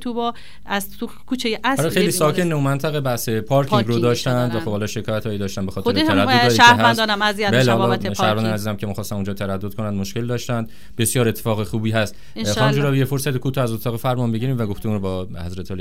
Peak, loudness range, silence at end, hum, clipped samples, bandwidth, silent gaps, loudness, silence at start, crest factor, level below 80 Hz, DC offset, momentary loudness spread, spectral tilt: 0 dBFS; 7 LU; 0 s; none; under 0.1%; 16 kHz; none; -19 LUFS; 0 s; 20 dB; -48 dBFS; 2%; 11 LU; -5 dB/octave